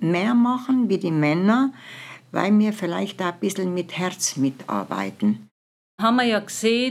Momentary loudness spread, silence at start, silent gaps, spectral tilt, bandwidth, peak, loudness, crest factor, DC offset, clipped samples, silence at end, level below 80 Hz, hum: 9 LU; 0 s; 5.51-5.98 s; -5 dB/octave; 14.5 kHz; -4 dBFS; -22 LUFS; 18 dB; under 0.1%; under 0.1%; 0 s; -84 dBFS; none